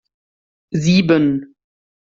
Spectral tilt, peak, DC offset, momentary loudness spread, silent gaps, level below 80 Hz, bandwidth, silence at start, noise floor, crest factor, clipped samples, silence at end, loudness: -6.5 dB/octave; -2 dBFS; under 0.1%; 12 LU; none; -52 dBFS; 7.6 kHz; 0.7 s; under -90 dBFS; 16 dB; under 0.1%; 0.65 s; -16 LUFS